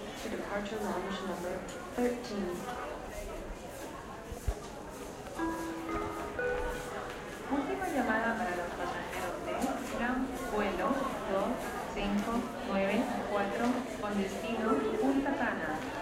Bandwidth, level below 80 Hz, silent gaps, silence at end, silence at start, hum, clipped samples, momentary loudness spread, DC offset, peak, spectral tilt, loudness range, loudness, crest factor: 16 kHz; -50 dBFS; none; 0 s; 0 s; none; under 0.1%; 11 LU; under 0.1%; -16 dBFS; -5 dB/octave; 7 LU; -35 LUFS; 18 dB